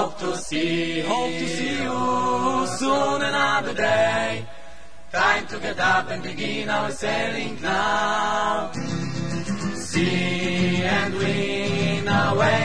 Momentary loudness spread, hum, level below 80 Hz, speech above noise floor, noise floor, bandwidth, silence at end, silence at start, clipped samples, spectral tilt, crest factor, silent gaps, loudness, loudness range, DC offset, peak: 8 LU; none; -50 dBFS; 23 dB; -46 dBFS; 10.5 kHz; 0 s; 0 s; under 0.1%; -4.5 dB/octave; 18 dB; none; -23 LUFS; 2 LU; 2%; -6 dBFS